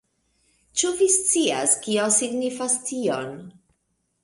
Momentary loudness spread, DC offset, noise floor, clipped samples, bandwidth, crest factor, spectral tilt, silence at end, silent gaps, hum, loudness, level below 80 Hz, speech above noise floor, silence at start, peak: 10 LU; under 0.1%; -73 dBFS; under 0.1%; 11.5 kHz; 18 dB; -2 dB/octave; 0.75 s; none; none; -21 LUFS; -66 dBFS; 50 dB; 0.75 s; -6 dBFS